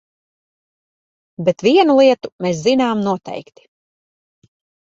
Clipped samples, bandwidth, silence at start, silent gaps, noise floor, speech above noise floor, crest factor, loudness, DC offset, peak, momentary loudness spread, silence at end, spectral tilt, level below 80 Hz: under 0.1%; 7.8 kHz; 1.4 s; 2.32-2.39 s; under -90 dBFS; over 75 dB; 16 dB; -15 LUFS; under 0.1%; -2 dBFS; 12 LU; 1.4 s; -5.5 dB/octave; -62 dBFS